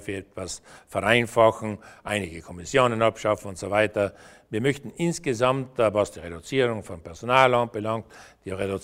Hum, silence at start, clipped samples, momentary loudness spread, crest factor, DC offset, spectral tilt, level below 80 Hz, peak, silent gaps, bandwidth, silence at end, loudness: none; 0 s; under 0.1%; 15 LU; 22 dB; under 0.1%; -5 dB/octave; -54 dBFS; -2 dBFS; none; 16 kHz; 0 s; -24 LUFS